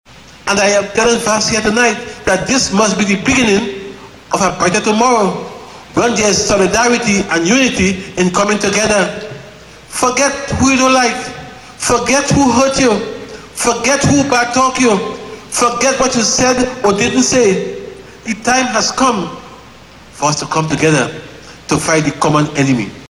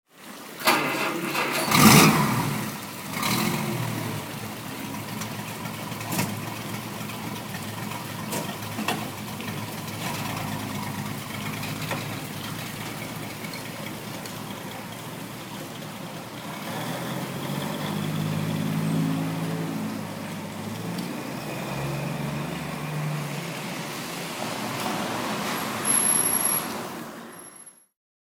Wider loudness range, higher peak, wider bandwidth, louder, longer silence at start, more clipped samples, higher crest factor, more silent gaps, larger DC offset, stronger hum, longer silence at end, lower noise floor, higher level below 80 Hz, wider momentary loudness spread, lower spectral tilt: second, 3 LU vs 13 LU; about the same, 0 dBFS vs 0 dBFS; second, 13.5 kHz vs 19.5 kHz; first, -13 LUFS vs -27 LUFS; first, 0.35 s vs 0.15 s; neither; second, 14 dB vs 28 dB; neither; neither; neither; second, 0.05 s vs 0.55 s; second, -38 dBFS vs -48 dBFS; first, -40 dBFS vs -56 dBFS; about the same, 14 LU vs 13 LU; about the same, -3.5 dB/octave vs -3.5 dB/octave